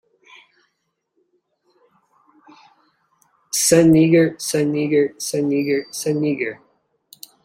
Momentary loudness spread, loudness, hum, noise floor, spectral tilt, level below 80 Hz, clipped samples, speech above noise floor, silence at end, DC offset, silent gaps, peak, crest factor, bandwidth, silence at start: 11 LU; -18 LUFS; none; -73 dBFS; -5 dB/octave; -58 dBFS; under 0.1%; 56 dB; 0.9 s; under 0.1%; none; -2 dBFS; 18 dB; 16.5 kHz; 3.55 s